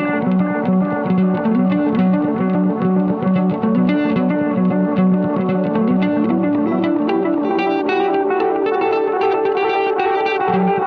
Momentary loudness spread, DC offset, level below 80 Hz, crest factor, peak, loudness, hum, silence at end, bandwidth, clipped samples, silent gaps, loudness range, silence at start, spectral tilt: 2 LU; under 0.1%; -58 dBFS; 12 dB; -4 dBFS; -17 LUFS; none; 0 s; 5 kHz; under 0.1%; none; 1 LU; 0 s; -10 dB/octave